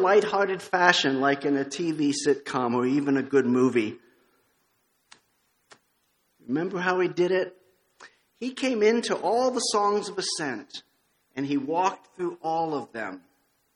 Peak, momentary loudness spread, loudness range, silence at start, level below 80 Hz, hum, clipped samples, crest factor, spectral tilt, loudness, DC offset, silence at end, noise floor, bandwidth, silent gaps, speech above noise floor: -2 dBFS; 14 LU; 7 LU; 0 s; -74 dBFS; none; under 0.1%; 26 dB; -4 dB/octave; -25 LUFS; under 0.1%; 0.55 s; -71 dBFS; 11.5 kHz; none; 46 dB